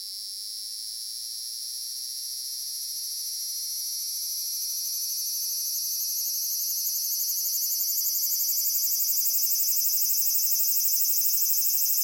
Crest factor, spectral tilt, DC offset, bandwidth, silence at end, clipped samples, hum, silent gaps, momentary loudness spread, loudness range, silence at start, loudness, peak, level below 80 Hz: 20 dB; 5.5 dB/octave; under 0.1%; 16.5 kHz; 0 s; under 0.1%; none; none; 11 LU; 9 LU; 0 s; -24 LUFS; -8 dBFS; -80 dBFS